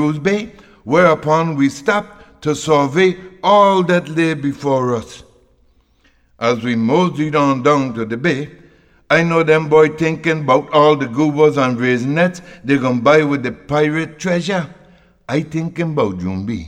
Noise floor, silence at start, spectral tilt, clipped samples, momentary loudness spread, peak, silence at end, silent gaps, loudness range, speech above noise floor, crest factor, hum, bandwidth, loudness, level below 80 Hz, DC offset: -55 dBFS; 0 s; -6 dB/octave; under 0.1%; 10 LU; 0 dBFS; 0 s; none; 5 LU; 40 dB; 14 dB; none; 10.5 kHz; -16 LUFS; -52 dBFS; under 0.1%